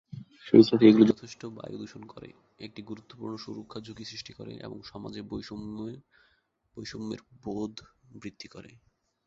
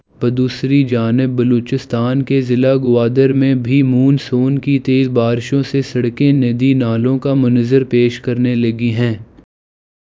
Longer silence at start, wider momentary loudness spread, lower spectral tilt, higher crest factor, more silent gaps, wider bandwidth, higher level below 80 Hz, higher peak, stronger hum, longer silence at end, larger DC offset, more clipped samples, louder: about the same, 0.15 s vs 0.2 s; first, 26 LU vs 5 LU; second, -7 dB/octave vs -8.5 dB/octave; first, 24 dB vs 14 dB; neither; about the same, 7.4 kHz vs 7.6 kHz; second, -64 dBFS vs -50 dBFS; second, -4 dBFS vs 0 dBFS; neither; second, 0.65 s vs 0.8 s; neither; neither; second, -24 LUFS vs -14 LUFS